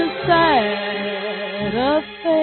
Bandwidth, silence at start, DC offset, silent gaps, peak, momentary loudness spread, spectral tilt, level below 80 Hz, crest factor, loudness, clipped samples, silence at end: 4.5 kHz; 0 s; under 0.1%; none; -4 dBFS; 10 LU; -10 dB/octave; -48 dBFS; 14 dB; -19 LUFS; under 0.1%; 0 s